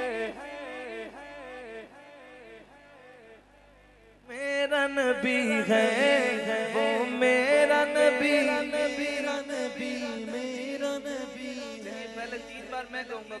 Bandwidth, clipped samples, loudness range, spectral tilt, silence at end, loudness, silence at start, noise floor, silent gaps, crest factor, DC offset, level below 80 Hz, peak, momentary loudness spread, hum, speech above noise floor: 12 kHz; under 0.1%; 19 LU; -3.5 dB/octave; 0 s; -27 LUFS; 0 s; -57 dBFS; none; 18 dB; under 0.1%; -66 dBFS; -10 dBFS; 19 LU; 50 Hz at -65 dBFS; 31 dB